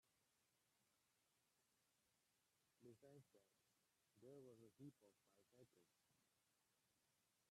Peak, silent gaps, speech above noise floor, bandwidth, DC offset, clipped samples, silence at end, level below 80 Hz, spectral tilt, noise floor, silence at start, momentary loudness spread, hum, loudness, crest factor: -52 dBFS; none; 19 dB; 13 kHz; under 0.1%; under 0.1%; 0 s; under -90 dBFS; -6 dB/octave; -87 dBFS; 0.05 s; 3 LU; none; -67 LUFS; 20 dB